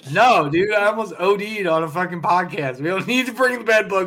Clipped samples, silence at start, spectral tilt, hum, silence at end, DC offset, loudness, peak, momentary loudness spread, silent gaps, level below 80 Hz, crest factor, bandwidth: under 0.1%; 0.05 s; -5 dB/octave; none; 0 s; under 0.1%; -19 LUFS; -4 dBFS; 8 LU; none; -60 dBFS; 14 dB; 16.5 kHz